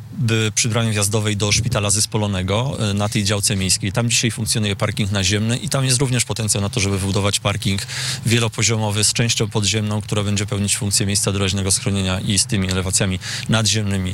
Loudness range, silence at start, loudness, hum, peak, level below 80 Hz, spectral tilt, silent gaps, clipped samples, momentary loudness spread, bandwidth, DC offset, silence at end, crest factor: 1 LU; 0 s; -18 LUFS; none; -8 dBFS; -46 dBFS; -3.5 dB/octave; none; under 0.1%; 4 LU; 16 kHz; under 0.1%; 0 s; 12 dB